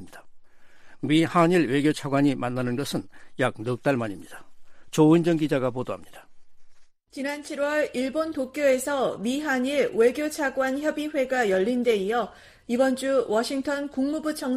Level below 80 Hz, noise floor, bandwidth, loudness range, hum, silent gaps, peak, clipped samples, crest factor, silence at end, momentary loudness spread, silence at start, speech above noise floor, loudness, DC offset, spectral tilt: -58 dBFS; -46 dBFS; 15 kHz; 3 LU; none; none; -6 dBFS; under 0.1%; 18 dB; 0 s; 11 LU; 0 s; 21 dB; -25 LUFS; under 0.1%; -5.5 dB/octave